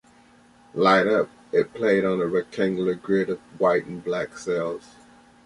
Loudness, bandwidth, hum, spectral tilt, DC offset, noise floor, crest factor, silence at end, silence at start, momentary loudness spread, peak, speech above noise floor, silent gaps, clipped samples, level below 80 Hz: -23 LUFS; 11.5 kHz; none; -6 dB/octave; under 0.1%; -54 dBFS; 18 dB; 0.65 s; 0.75 s; 10 LU; -6 dBFS; 32 dB; none; under 0.1%; -62 dBFS